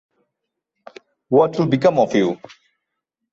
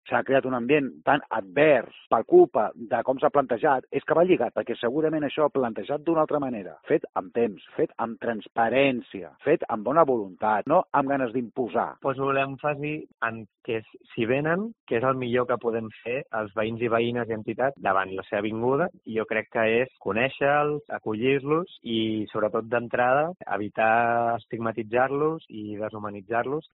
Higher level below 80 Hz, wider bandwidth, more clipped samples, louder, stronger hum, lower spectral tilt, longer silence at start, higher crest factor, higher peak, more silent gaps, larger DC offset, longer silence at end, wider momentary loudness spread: about the same, -62 dBFS vs -64 dBFS; first, 7.8 kHz vs 4.1 kHz; neither; first, -17 LUFS vs -25 LUFS; neither; first, -7 dB/octave vs -4.5 dB/octave; first, 1.3 s vs 0.05 s; about the same, 18 dB vs 20 dB; first, -2 dBFS vs -6 dBFS; second, none vs 7.09-7.13 s, 14.80-14.87 s; neither; first, 0.95 s vs 0.15 s; second, 6 LU vs 9 LU